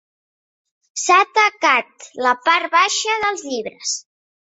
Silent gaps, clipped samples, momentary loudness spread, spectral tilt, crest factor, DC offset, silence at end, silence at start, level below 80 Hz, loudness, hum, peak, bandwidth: none; under 0.1%; 12 LU; 0.5 dB/octave; 18 dB; under 0.1%; 0.4 s; 0.95 s; -66 dBFS; -17 LUFS; none; -2 dBFS; 8.4 kHz